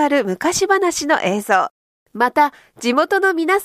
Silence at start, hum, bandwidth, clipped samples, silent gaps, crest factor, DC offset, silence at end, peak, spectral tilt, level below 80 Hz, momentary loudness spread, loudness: 0 s; none; 15.5 kHz; under 0.1%; 1.71-2.06 s; 14 dB; under 0.1%; 0 s; -4 dBFS; -3 dB/octave; -58 dBFS; 4 LU; -17 LUFS